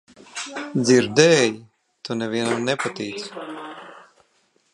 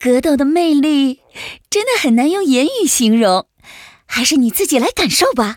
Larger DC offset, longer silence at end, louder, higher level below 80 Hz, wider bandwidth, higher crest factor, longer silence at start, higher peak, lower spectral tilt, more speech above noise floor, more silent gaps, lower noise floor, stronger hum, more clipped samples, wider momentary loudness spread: neither; first, 0.75 s vs 0 s; second, -20 LUFS vs -14 LUFS; second, -66 dBFS vs -48 dBFS; second, 11.5 kHz vs over 20 kHz; first, 22 dB vs 14 dB; first, 0.35 s vs 0 s; about the same, 0 dBFS vs 0 dBFS; about the same, -4 dB/octave vs -3 dB/octave; first, 44 dB vs 26 dB; neither; first, -64 dBFS vs -40 dBFS; neither; neither; first, 21 LU vs 7 LU